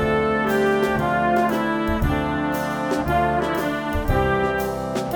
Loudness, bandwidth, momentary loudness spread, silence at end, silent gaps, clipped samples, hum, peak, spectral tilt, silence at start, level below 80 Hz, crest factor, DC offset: -21 LUFS; over 20 kHz; 5 LU; 0 s; none; under 0.1%; none; -6 dBFS; -6.5 dB/octave; 0 s; -34 dBFS; 14 dB; under 0.1%